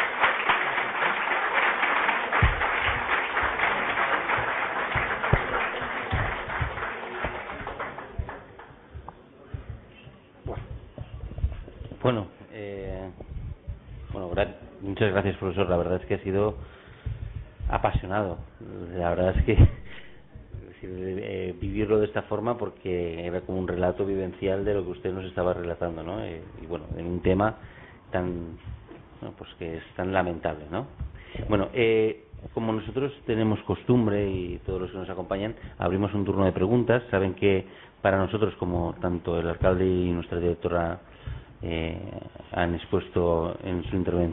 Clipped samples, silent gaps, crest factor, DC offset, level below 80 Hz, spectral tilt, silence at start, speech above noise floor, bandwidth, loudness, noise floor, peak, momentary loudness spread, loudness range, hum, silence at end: under 0.1%; none; 20 dB; under 0.1%; -40 dBFS; -10.5 dB/octave; 0 s; 23 dB; 4 kHz; -27 LUFS; -50 dBFS; -8 dBFS; 18 LU; 9 LU; none; 0 s